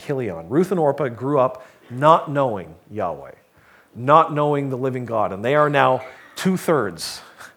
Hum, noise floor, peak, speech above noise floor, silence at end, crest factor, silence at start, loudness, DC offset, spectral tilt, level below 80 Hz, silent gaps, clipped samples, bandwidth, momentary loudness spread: none; -53 dBFS; 0 dBFS; 33 dB; 0.1 s; 20 dB; 0 s; -20 LUFS; under 0.1%; -6 dB/octave; -62 dBFS; none; under 0.1%; 19 kHz; 15 LU